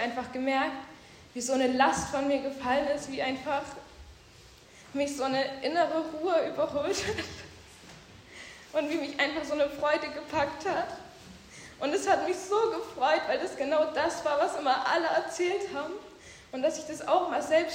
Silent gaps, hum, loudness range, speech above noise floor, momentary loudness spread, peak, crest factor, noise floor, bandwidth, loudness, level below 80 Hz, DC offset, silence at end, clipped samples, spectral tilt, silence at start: none; none; 4 LU; 25 dB; 19 LU; -10 dBFS; 20 dB; -54 dBFS; 16 kHz; -29 LUFS; -62 dBFS; under 0.1%; 0 s; under 0.1%; -3.5 dB/octave; 0 s